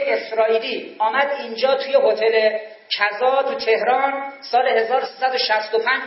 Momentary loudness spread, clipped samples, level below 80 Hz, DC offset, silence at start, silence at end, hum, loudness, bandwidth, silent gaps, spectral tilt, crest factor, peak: 5 LU; under 0.1%; -80 dBFS; under 0.1%; 0 s; 0 s; none; -19 LUFS; 6 kHz; none; -4.5 dB/octave; 16 dB; -4 dBFS